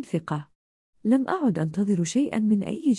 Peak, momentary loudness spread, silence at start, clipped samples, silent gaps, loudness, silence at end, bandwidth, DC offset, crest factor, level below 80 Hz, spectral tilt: -10 dBFS; 8 LU; 0 s; under 0.1%; 0.55-0.93 s; -25 LUFS; 0 s; 11.5 kHz; under 0.1%; 14 dB; -66 dBFS; -6.5 dB/octave